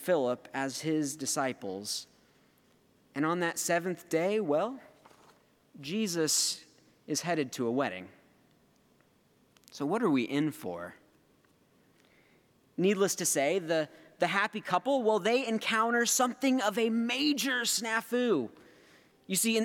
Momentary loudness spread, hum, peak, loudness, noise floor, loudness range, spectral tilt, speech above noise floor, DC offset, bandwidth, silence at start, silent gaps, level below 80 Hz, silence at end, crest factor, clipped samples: 11 LU; none; -12 dBFS; -30 LUFS; -67 dBFS; 7 LU; -3 dB/octave; 37 dB; under 0.1%; 19 kHz; 0 s; none; -82 dBFS; 0 s; 20 dB; under 0.1%